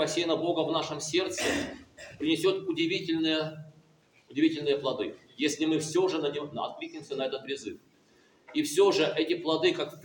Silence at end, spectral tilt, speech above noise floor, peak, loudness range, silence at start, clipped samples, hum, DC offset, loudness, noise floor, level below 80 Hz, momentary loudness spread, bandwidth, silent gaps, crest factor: 0 s; -4 dB/octave; 34 dB; -12 dBFS; 3 LU; 0 s; under 0.1%; none; under 0.1%; -29 LUFS; -63 dBFS; -68 dBFS; 11 LU; 17 kHz; none; 18 dB